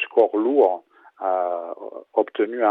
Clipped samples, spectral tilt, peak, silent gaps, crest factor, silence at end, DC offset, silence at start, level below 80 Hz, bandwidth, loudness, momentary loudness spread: under 0.1%; -6.5 dB/octave; -6 dBFS; none; 16 dB; 0 s; under 0.1%; 0 s; -78 dBFS; 4 kHz; -22 LUFS; 13 LU